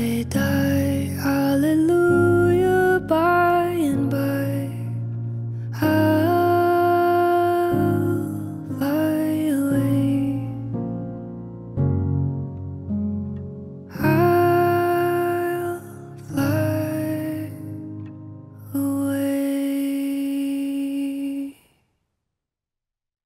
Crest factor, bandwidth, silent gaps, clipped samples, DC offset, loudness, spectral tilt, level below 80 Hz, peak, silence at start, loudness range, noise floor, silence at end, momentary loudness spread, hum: 14 dB; 16 kHz; none; under 0.1%; under 0.1%; -21 LUFS; -7.5 dB/octave; -50 dBFS; -6 dBFS; 0 s; 8 LU; -86 dBFS; 1.75 s; 15 LU; none